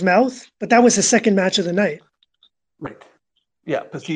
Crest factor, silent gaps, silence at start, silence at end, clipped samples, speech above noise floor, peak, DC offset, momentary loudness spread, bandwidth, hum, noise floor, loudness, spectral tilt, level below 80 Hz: 16 dB; none; 0 s; 0 s; under 0.1%; 53 dB; -2 dBFS; under 0.1%; 22 LU; 10 kHz; none; -70 dBFS; -17 LUFS; -3.5 dB/octave; -64 dBFS